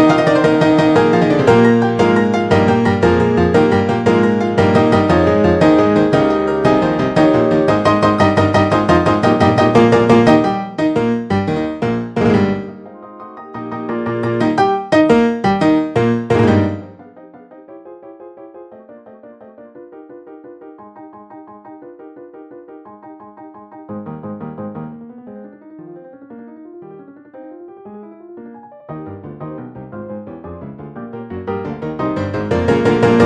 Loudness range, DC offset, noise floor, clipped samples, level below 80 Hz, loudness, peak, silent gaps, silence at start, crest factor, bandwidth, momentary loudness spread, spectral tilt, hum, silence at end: 21 LU; under 0.1%; -40 dBFS; under 0.1%; -42 dBFS; -14 LUFS; 0 dBFS; none; 0 s; 16 dB; 9.8 kHz; 24 LU; -7.5 dB/octave; none; 0 s